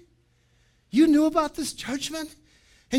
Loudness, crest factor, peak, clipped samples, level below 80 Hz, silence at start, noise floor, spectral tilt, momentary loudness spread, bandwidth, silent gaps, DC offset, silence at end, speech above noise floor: -24 LUFS; 16 dB; -8 dBFS; under 0.1%; -54 dBFS; 0.95 s; -64 dBFS; -3.5 dB/octave; 14 LU; 15.5 kHz; none; under 0.1%; 0 s; 41 dB